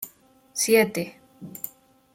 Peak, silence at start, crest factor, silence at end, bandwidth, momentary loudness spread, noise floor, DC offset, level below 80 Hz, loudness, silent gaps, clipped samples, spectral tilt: -8 dBFS; 0 s; 20 dB; 0.45 s; 16.5 kHz; 21 LU; -55 dBFS; under 0.1%; -70 dBFS; -23 LUFS; none; under 0.1%; -3 dB/octave